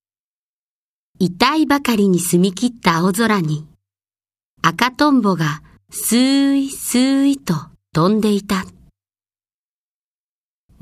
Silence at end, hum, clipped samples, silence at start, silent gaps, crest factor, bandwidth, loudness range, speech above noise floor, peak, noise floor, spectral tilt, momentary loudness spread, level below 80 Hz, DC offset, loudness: 2.1 s; none; under 0.1%; 1.2 s; 4.44-4.57 s; 18 dB; 15.5 kHz; 3 LU; over 74 dB; 0 dBFS; under -90 dBFS; -5 dB/octave; 9 LU; -52 dBFS; under 0.1%; -17 LUFS